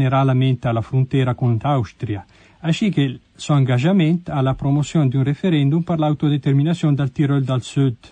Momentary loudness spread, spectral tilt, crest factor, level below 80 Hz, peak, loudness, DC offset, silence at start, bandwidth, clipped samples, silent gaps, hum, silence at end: 6 LU; -7.5 dB/octave; 12 dB; -48 dBFS; -6 dBFS; -19 LUFS; under 0.1%; 0 s; 9.2 kHz; under 0.1%; none; none; 0.15 s